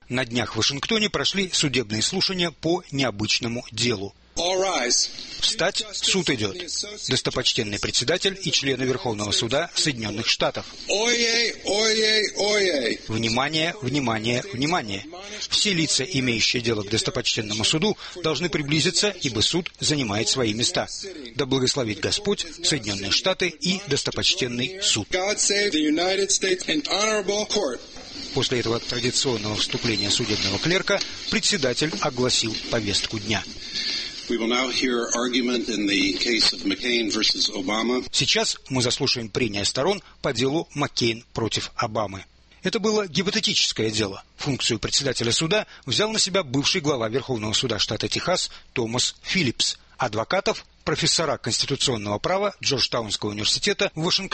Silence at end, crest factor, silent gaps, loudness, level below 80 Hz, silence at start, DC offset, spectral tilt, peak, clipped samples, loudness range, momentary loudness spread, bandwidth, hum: 0.05 s; 18 dB; none; -23 LUFS; -50 dBFS; 0.1 s; under 0.1%; -3 dB/octave; -6 dBFS; under 0.1%; 3 LU; 6 LU; 8.8 kHz; none